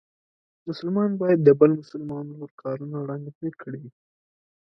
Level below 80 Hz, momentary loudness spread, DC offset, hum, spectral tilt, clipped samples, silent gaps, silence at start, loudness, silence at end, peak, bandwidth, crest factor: -70 dBFS; 20 LU; under 0.1%; none; -10 dB/octave; under 0.1%; 2.51-2.58 s, 3.35-3.41 s; 0.65 s; -23 LUFS; 0.8 s; -4 dBFS; 6 kHz; 22 dB